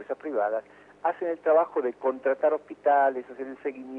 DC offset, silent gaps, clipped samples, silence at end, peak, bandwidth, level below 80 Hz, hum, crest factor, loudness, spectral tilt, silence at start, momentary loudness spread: under 0.1%; none; under 0.1%; 0 s; -12 dBFS; 3.9 kHz; -76 dBFS; 50 Hz at -65 dBFS; 16 dB; -27 LUFS; -7 dB/octave; 0 s; 12 LU